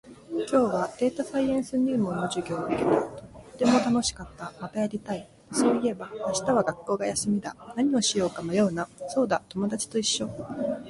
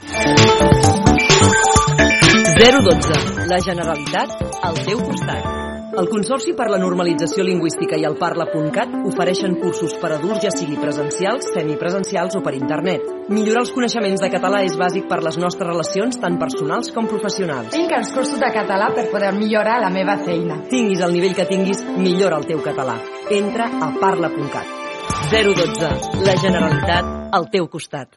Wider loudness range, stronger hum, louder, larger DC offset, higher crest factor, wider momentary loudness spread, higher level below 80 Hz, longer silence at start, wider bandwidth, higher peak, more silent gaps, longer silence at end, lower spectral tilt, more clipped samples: second, 1 LU vs 8 LU; neither; second, -27 LUFS vs -17 LUFS; neither; about the same, 18 dB vs 18 dB; about the same, 11 LU vs 10 LU; second, -58 dBFS vs -36 dBFS; about the same, 0.05 s vs 0 s; about the same, 11.5 kHz vs 11.5 kHz; second, -8 dBFS vs 0 dBFS; neither; about the same, 0 s vs 0.1 s; about the same, -4.5 dB/octave vs -4.5 dB/octave; neither